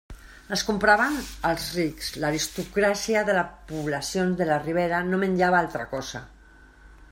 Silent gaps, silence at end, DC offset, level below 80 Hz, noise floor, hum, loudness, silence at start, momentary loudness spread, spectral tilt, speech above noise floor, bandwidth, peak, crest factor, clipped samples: none; 0.1 s; under 0.1%; -48 dBFS; -51 dBFS; none; -25 LUFS; 0.1 s; 11 LU; -4.5 dB/octave; 26 dB; 16 kHz; -6 dBFS; 20 dB; under 0.1%